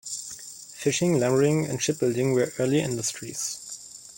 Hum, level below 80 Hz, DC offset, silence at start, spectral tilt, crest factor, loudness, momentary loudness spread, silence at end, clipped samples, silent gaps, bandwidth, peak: none; -64 dBFS; under 0.1%; 0.05 s; -4.5 dB/octave; 16 dB; -25 LUFS; 15 LU; 0.05 s; under 0.1%; none; 17 kHz; -10 dBFS